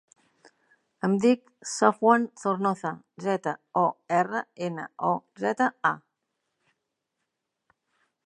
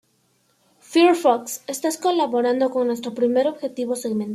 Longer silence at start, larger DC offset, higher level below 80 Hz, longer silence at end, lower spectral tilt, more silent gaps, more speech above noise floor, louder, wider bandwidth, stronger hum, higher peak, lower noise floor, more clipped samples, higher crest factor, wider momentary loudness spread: first, 1.05 s vs 0.9 s; neither; second, -80 dBFS vs -74 dBFS; first, 2.3 s vs 0 s; first, -5.5 dB/octave vs -4 dB/octave; neither; first, 56 dB vs 44 dB; second, -26 LUFS vs -21 LUFS; second, 11.5 kHz vs 15 kHz; neither; about the same, -4 dBFS vs -4 dBFS; first, -82 dBFS vs -64 dBFS; neither; first, 24 dB vs 18 dB; about the same, 11 LU vs 9 LU